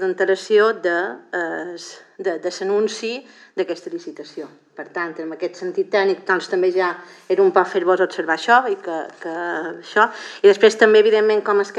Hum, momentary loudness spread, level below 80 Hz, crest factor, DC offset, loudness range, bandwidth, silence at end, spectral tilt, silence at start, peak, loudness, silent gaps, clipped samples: none; 18 LU; -86 dBFS; 18 dB; under 0.1%; 9 LU; 9 kHz; 0 s; -4 dB/octave; 0 s; 0 dBFS; -19 LUFS; none; under 0.1%